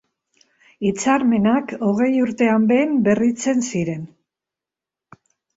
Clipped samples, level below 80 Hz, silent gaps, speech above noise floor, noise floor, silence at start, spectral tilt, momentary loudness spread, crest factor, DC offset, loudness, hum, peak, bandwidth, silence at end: under 0.1%; -58 dBFS; none; 70 dB; -88 dBFS; 0.8 s; -6 dB/octave; 8 LU; 18 dB; under 0.1%; -19 LUFS; none; -2 dBFS; 8 kHz; 1.5 s